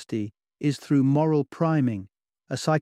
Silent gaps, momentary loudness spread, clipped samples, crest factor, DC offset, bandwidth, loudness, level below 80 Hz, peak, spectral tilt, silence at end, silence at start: none; 13 LU; under 0.1%; 16 dB; under 0.1%; 13 kHz; -25 LUFS; -66 dBFS; -10 dBFS; -7 dB/octave; 0 s; 0 s